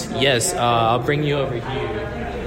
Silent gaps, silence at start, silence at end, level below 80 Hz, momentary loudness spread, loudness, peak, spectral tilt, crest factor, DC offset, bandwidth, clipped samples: none; 0 s; 0 s; -38 dBFS; 9 LU; -20 LUFS; -4 dBFS; -4 dB/octave; 16 dB; under 0.1%; 16.5 kHz; under 0.1%